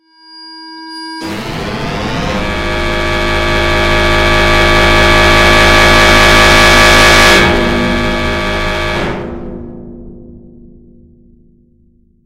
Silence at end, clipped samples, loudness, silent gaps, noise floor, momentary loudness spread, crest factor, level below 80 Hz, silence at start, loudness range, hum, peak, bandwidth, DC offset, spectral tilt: 1.9 s; 0.5%; -8 LUFS; none; -49 dBFS; 20 LU; 10 dB; -18 dBFS; 0.35 s; 14 LU; none; 0 dBFS; 16.5 kHz; under 0.1%; -3.5 dB/octave